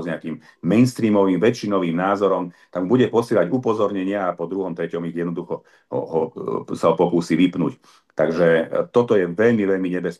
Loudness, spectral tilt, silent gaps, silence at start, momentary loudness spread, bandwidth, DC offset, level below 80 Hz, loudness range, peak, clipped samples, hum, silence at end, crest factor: -20 LUFS; -7 dB/octave; none; 0 s; 11 LU; 12.5 kHz; under 0.1%; -66 dBFS; 4 LU; -4 dBFS; under 0.1%; none; 0.05 s; 16 dB